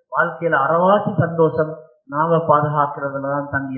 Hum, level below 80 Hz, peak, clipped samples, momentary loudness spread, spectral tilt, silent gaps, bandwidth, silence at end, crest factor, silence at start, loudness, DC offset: none; -54 dBFS; -2 dBFS; under 0.1%; 9 LU; -12.5 dB/octave; none; 4.3 kHz; 0 s; 16 dB; 0.1 s; -18 LUFS; under 0.1%